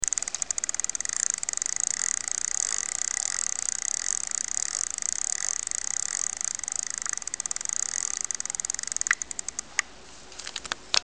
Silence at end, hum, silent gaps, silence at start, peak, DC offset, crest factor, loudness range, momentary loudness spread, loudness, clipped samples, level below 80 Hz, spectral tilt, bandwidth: 0 s; none; none; 0 s; 0 dBFS; 0.4%; 30 dB; 2 LU; 5 LU; -27 LUFS; under 0.1%; -62 dBFS; 2.5 dB/octave; 10.5 kHz